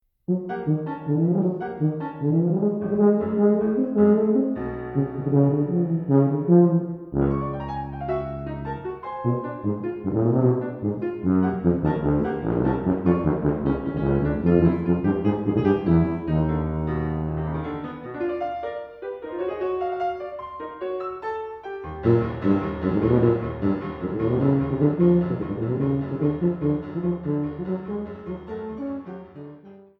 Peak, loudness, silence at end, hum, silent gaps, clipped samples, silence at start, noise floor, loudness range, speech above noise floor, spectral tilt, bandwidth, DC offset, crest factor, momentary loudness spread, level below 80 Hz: -4 dBFS; -24 LUFS; 0.2 s; none; none; under 0.1%; 0.3 s; -45 dBFS; 7 LU; 25 dB; -12 dB/octave; 4.7 kHz; under 0.1%; 18 dB; 12 LU; -42 dBFS